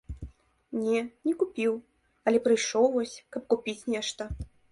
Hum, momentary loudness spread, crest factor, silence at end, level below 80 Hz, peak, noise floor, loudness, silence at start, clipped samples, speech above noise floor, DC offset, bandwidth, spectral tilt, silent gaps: none; 15 LU; 18 dB; 0.25 s; -50 dBFS; -10 dBFS; -47 dBFS; -29 LUFS; 0.1 s; under 0.1%; 20 dB; under 0.1%; 11.5 kHz; -4 dB/octave; none